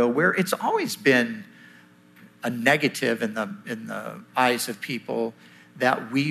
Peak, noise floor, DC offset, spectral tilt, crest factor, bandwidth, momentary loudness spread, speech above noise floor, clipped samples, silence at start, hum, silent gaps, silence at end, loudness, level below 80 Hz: -4 dBFS; -52 dBFS; under 0.1%; -4.5 dB/octave; 22 dB; 15 kHz; 12 LU; 28 dB; under 0.1%; 0 s; none; none; 0 s; -24 LUFS; -76 dBFS